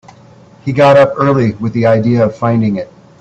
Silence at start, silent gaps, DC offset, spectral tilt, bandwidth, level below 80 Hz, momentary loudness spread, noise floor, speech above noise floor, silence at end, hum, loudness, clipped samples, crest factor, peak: 0.65 s; none; under 0.1%; -8.5 dB/octave; 8.2 kHz; -48 dBFS; 13 LU; -40 dBFS; 30 dB; 0.35 s; none; -11 LUFS; under 0.1%; 12 dB; 0 dBFS